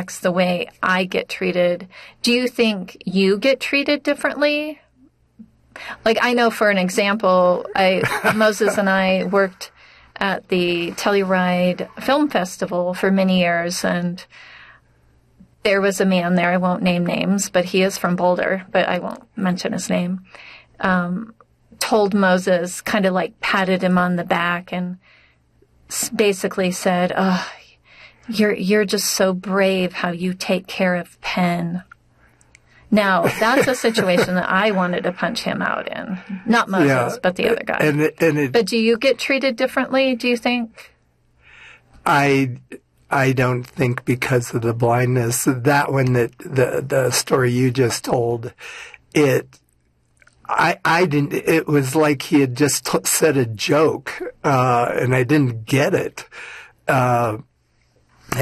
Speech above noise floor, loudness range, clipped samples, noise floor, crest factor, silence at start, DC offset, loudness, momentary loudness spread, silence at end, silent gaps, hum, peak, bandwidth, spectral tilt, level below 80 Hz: 43 dB; 4 LU; under 0.1%; -62 dBFS; 14 dB; 0 s; under 0.1%; -19 LUFS; 9 LU; 0 s; none; none; -6 dBFS; 14 kHz; -5 dB/octave; -56 dBFS